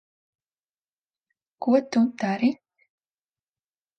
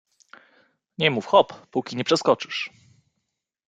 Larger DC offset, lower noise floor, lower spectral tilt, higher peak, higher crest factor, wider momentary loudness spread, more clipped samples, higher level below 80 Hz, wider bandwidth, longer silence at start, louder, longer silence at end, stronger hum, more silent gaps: neither; first, under -90 dBFS vs -80 dBFS; first, -6.5 dB/octave vs -4.5 dB/octave; second, -10 dBFS vs -4 dBFS; about the same, 20 dB vs 22 dB; about the same, 9 LU vs 11 LU; neither; second, -78 dBFS vs -70 dBFS; second, 6.6 kHz vs 9.4 kHz; first, 1.6 s vs 1 s; about the same, -24 LUFS vs -23 LUFS; first, 1.45 s vs 1 s; neither; neither